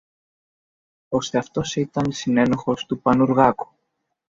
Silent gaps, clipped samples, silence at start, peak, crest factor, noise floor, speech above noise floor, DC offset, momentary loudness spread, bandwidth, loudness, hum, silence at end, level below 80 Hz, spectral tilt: none; under 0.1%; 1.1 s; -2 dBFS; 20 dB; -76 dBFS; 55 dB; under 0.1%; 9 LU; 7.6 kHz; -21 LUFS; none; 0.65 s; -54 dBFS; -6 dB/octave